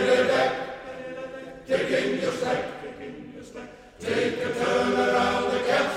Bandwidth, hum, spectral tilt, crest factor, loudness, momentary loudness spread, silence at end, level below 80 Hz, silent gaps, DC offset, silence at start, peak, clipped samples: 13.5 kHz; none; -4.5 dB/octave; 16 dB; -25 LUFS; 18 LU; 0 s; -58 dBFS; none; under 0.1%; 0 s; -10 dBFS; under 0.1%